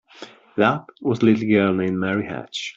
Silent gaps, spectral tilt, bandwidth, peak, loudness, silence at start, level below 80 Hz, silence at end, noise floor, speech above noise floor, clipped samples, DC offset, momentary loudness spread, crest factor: none; -6.5 dB/octave; 7.8 kHz; -4 dBFS; -21 LUFS; 0.2 s; -60 dBFS; 0.05 s; -43 dBFS; 23 dB; under 0.1%; under 0.1%; 10 LU; 18 dB